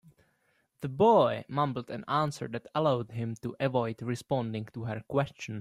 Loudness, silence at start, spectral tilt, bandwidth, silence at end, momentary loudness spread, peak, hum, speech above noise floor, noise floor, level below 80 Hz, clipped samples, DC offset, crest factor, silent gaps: -30 LUFS; 0.8 s; -7 dB/octave; 15 kHz; 0 s; 14 LU; -12 dBFS; none; 43 dB; -73 dBFS; -66 dBFS; under 0.1%; under 0.1%; 18 dB; none